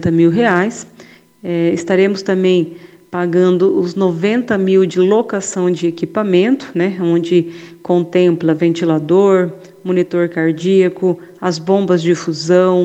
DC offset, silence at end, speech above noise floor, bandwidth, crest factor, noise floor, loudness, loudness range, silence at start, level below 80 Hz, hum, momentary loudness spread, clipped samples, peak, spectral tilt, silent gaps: under 0.1%; 0 s; 29 dB; 8.6 kHz; 14 dB; -42 dBFS; -14 LUFS; 1 LU; 0 s; -60 dBFS; none; 8 LU; under 0.1%; 0 dBFS; -6.5 dB/octave; none